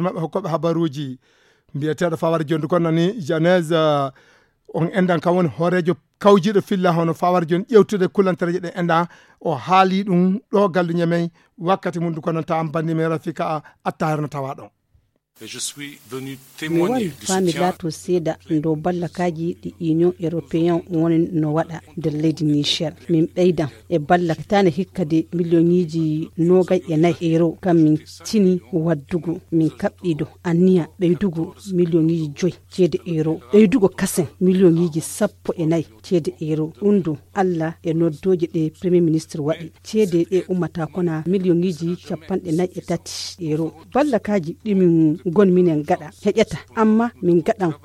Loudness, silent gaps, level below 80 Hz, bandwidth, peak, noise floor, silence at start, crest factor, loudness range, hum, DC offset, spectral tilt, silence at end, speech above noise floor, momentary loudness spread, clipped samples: -20 LUFS; none; -56 dBFS; 14.5 kHz; -2 dBFS; -62 dBFS; 0 s; 18 dB; 5 LU; none; under 0.1%; -6.5 dB/octave; 0.1 s; 43 dB; 10 LU; under 0.1%